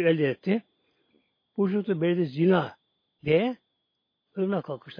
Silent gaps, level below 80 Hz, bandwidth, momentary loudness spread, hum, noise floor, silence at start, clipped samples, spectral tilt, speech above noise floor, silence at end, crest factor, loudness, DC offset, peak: none; -68 dBFS; 5.2 kHz; 14 LU; none; -79 dBFS; 0 s; under 0.1%; -10 dB/octave; 54 dB; 0.05 s; 18 dB; -27 LUFS; under 0.1%; -10 dBFS